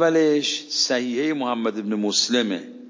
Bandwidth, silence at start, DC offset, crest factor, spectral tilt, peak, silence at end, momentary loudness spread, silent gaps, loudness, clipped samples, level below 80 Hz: 7.6 kHz; 0 s; under 0.1%; 14 dB; -3 dB/octave; -8 dBFS; 0 s; 6 LU; none; -22 LUFS; under 0.1%; -80 dBFS